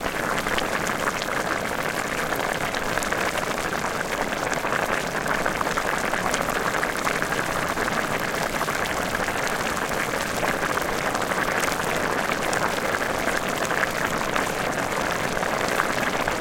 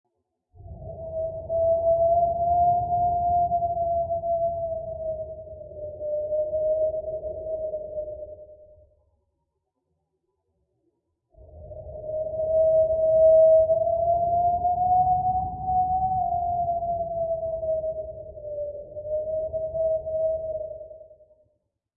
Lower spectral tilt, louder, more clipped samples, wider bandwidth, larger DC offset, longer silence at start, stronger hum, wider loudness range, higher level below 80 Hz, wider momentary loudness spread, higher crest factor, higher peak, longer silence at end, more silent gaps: second, -3 dB/octave vs -15 dB/octave; about the same, -24 LUFS vs -24 LUFS; neither; first, 17 kHz vs 1.1 kHz; neither; second, 0 s vs 0.6 s; neither; second, 1 LU vs 12 LU; about the same, -44 dBFS vs -48 dBFS; second, 2 LU vs 17 LU; first, 24 dB vs 14 dB; first, -2 dBFS vs -10 dBFS; second, 0 s vs 0.85 s; neither